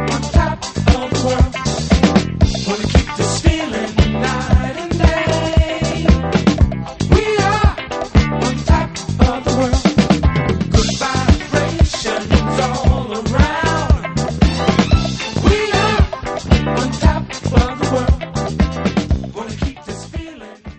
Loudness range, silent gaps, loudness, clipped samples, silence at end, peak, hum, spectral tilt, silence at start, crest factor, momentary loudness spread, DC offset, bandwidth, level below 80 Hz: 2 LU; none; -16 LUFS; under 0.1%; 0.05 s; 0 dBFS; none; -5.5 dB/octave; 0 s; 16 dB; 7 LU; under 0.1%; 8.8 kHz; -20 dBFS